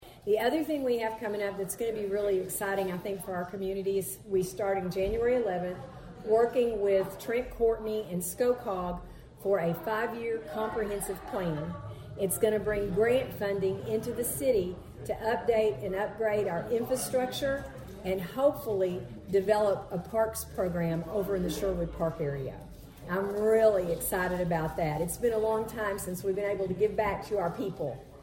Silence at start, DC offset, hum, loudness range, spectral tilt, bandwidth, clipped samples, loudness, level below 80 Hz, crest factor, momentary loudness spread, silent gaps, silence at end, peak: 0 s; under 0.1%; none; 3 LU; -5.5 dB/octave; 17 kHz; under 0.1%; -31 LUFS; -52 dBFS; 18 dB; 8 LU; none; 0 s; -12 dBFS